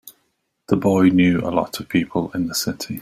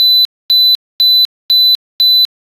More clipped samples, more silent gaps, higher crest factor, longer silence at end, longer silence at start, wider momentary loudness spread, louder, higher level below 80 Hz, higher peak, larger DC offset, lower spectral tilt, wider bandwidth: neither; second, none vs 0.25-0.49 s, 0.75-0.99 s, 1.25-1.49 s, 1.75-1.99 s; first, 18 dB vs 8 dB; second, 0 s vs 0.25 s; about the same, 0.05 s vs 0 s; first, 9 LU vs 2 LU; second, -19 LUFS vs -8 LUFS; first, -52 dBFS vs -66 dBFS; about the same, -2 dBFS vs -4 dBFS; neither; first, -5.5 dB/octave vs 2 dB/octave; first, 16 kHz vs 13 kHz